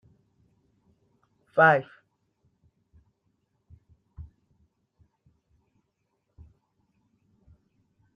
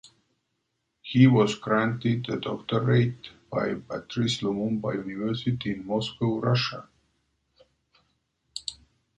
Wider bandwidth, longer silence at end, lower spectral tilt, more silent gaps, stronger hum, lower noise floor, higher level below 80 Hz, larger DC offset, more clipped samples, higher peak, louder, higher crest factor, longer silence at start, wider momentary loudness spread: about the same, 9.6 kHz vs 9.2 kHz; first, 3.95 s vs 0.45 s; about the same, -7.5 dB/octave vs -6.5 dB/octave; neither; neither; about the same, -77 dBFS vs -78 dBFS; about the same, -64 dBFS vs -60 dBFS; neither; neither; about the same, -6 dBFS vs -6 dBFS; first, -22 LUFS vs -26 LUFS; about the same, 26 dB vs 22 dB; first, 1.55 s vs 1.05 s; first, 29 LU vs 15 LU